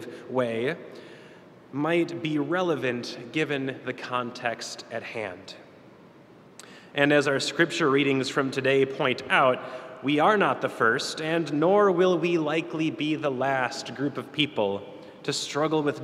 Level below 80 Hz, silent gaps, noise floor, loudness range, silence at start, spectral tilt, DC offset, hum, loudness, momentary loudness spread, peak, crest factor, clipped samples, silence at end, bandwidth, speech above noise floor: -74 dBFS; none; -51 dBFS; 8 LU; 0 s; -5 dB/octave; under 0.1%; none; -26 LUFS; 13 LU; -4 dBFS; 22 dB; under 0.1%; 0 s; 14 kHz; 26 dB